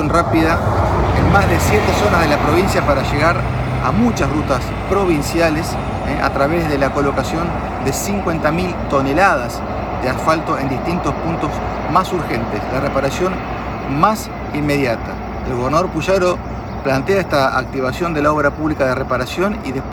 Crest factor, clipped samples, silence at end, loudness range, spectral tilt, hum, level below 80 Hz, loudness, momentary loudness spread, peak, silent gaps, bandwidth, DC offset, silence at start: 16 dB; under 0.1%; 0 s; 4 LU; -6 dB/octave; none; -30 dBFS; -17 LUFS; 7 LU; 0 dBFS; none; 19.5 kHz; under 0.1%; 0 s